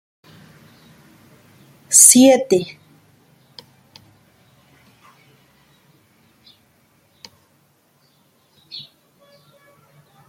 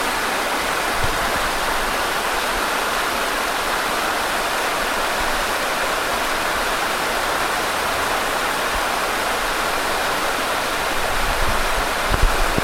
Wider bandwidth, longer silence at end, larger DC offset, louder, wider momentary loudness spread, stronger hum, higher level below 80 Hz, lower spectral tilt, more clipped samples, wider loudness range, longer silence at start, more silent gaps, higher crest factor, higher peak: about the same, 16.5 kHz vs 16.5 kHz; first, 1.5 s vs 0 s; neither; first, -10 LUFS vs -20 LUFS; first, 28 LU vs 0 LU; neither; second, -68 dBFS vs -30 dBFS; about the same, -2 dB/octave vs -2 dB/octave; neither; first, 8 LU vs 0 LU; first, 1.9 s vs 0 s; neither; about the same, 22 dB vs 18 dB; about the same, 0 dBFS vs -2 dBFS